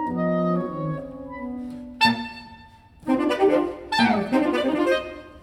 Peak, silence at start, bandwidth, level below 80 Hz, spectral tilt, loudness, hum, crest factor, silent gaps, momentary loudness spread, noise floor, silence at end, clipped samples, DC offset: -6 dBFS; 0 s; 16 kHz; -54 dBFS; -6 dB/octave; -23 LUFS; none; 18 dB; none; 16 LU; -48 dBFS; 0 s; under 0.1%; under 0.1%